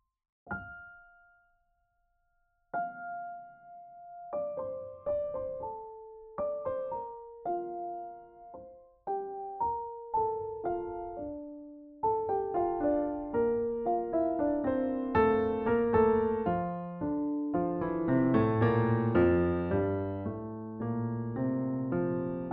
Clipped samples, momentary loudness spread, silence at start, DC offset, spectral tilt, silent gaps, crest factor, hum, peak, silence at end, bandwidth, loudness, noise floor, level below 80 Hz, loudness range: under 0.1%; 19 LU; 0.45 s; under 0.1%; -8.5 dB/octave; none; 18 dB; none; -14 dBFS; 0 s; 4.8 kHz; -32 LUFS; -75 dBFS; -56 dBFS; 12 LU